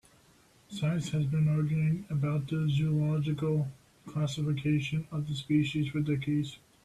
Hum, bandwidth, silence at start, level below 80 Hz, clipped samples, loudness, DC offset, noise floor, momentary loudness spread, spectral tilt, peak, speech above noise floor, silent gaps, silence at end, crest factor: none; 11 kHz; 0.7 s; -60 dBFS; under 0.1%; -31 LUFS; under 0.1%; -62 dBFS; 6 LU; -7.5 dB/octave; -16 dBFS; 33 dB; none; 0.3 s; 14 dB